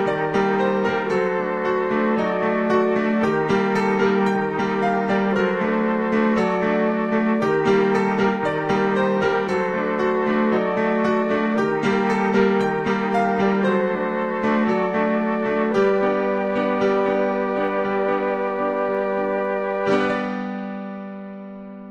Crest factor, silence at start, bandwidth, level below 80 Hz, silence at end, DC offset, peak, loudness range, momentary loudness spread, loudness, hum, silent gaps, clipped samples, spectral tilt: 16 dB; 0 s; 8.8 kHz; -56 dBFS; 0 s; 0.1%; -6 dBFS; 2 LU; 4 LU; -21 LUFS; none; none; under 0.1%; -7 dB/octave